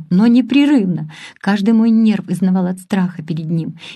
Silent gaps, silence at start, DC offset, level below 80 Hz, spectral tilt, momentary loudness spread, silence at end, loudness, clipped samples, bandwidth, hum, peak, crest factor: none; 0 s; under 0.1%; -62 dBFS; -7.5 dB/octave; 11 LU; 0 s; -15 LUFS; under 0.1%; 12 kHz; none; -2 dBFS; 12 dB